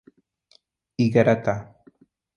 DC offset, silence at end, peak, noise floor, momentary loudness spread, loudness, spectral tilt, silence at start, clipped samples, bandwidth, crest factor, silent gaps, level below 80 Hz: under 0.1%; 0.75 s; -2 dBFS; -62 dBFS; 14 LU; -22 LUFS; -8 dB/octave; 1 s; under 0.1%; 7 kHz; 22 dB; none; -58 dBFS